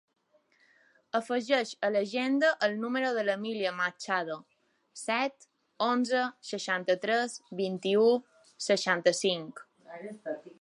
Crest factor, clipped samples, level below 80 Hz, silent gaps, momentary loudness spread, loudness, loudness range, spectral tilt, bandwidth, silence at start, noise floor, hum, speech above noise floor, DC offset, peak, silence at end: 20 dB; under 0.1%; -86 dBFS; none; 14 LU; -30 LUFS; 3 LU; -3.5 dB/octave; 11.5 kHz; 1.15 s; -68 dBFS; none; 38 dB; under 0.1%; -10 dBFS; 0.1 s